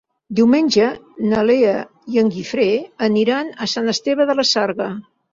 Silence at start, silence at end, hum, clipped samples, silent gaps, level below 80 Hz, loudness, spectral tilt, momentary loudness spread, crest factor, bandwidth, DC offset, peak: 0.3 s; 0.3 s; none; under 0.1%; none; -58 dBFS; -18 LUFS; -4.5 dB/octave; 9 LU; 14 dB; 7.6 kHz; under 0.1%; -2 dBFS